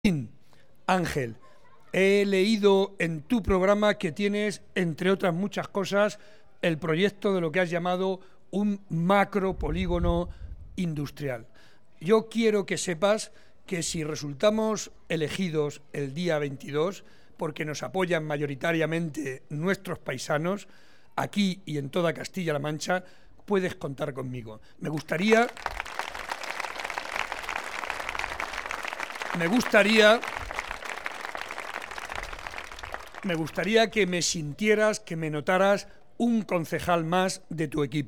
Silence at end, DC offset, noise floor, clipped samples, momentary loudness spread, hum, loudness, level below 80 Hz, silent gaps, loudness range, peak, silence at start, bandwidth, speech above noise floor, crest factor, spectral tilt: 0 s; 0.4%; -61 dBFS; under 0.1%; 13 LU; none; -27 LUFS; -48 dBFS; none; 6 LU; -6 dBFS; 0.05 s; 17.5 kHz; 35 dB; 22 dB; -5 dB/octave